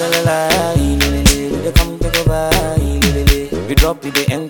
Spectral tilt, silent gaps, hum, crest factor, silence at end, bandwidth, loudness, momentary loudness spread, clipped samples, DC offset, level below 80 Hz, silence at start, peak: -4.5 dB/octave; none; none; 14 dB; 0 s; 19.5 kHz; -14 LUFS; 4 LU; under 0.1%; under 0.1%; -18 dBFS; 0 s; 0 dBFS